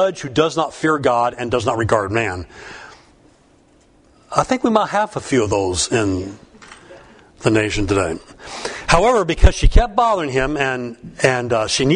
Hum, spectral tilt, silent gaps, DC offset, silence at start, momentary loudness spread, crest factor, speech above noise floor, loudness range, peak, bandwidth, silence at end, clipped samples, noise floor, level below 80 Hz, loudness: none; -4.5 dB/octave; none; under 0.1%; 0 s; 13 LU; 18 dB; 36 dB; 5 LU; 0 dBFS; 10.5 kHz; 0 s; under 0.1%; -53 dBFS; -26 dBFS; -18 LUFS